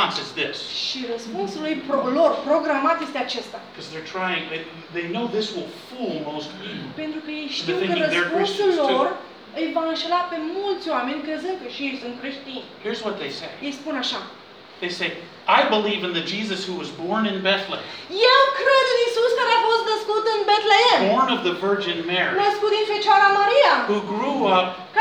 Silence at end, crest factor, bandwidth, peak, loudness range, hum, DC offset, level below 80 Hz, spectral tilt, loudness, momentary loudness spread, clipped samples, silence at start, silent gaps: 0 s; 20 dB; 12.5 kHz; -2 dBFS; 10 LU; none; under 0.1%; -72 dBFS; -4 dB/octave; -21 LUFS; 15 LU; under 0.1%; 0 s; none